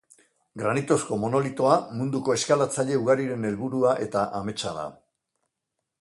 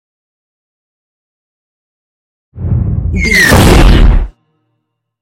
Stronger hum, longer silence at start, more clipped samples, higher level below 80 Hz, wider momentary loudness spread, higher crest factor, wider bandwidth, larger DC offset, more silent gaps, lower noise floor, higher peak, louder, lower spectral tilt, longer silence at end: neither; second, 0.55 s vs 2.55 s; second, under 0.1% vs 0.6%; second, -62 dBFS vs -14 dBFS; second, 8 LU vs 12 LU; first, 20 dB vs 12 dB; second, 11.5 kHz vs 17 kHz; neither; neither; first, -83 dBFS vs -68 dBFS; second, -6 dBFS vs 0 dBFS; second, -25 LUFS vs -8 LUFS; about the same, -5 dB/octave vs -5 dB/octave; first, 1.05 s vs 0.9 s